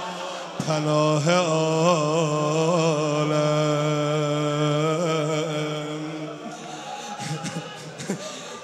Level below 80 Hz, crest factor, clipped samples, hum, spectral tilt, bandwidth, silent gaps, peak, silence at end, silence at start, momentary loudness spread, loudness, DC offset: -70 dBFS; 20 dB; under 0.1%; none; -5.5 dB/octave; 12.5 kHz; none; -4 dBFS; 0 s; 0 s; 13 LU; -24 LUFS; under 0.1%